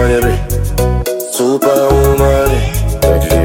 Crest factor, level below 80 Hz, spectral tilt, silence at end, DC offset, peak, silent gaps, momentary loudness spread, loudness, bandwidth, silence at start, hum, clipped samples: 10 dB; -16 dBFS; -5.5 dB/octave; 0 s; under 0.1%; 0 dBFS; none; 6 LU; -12 LUFS; 17 kHz; 0 s; none; under 0.1%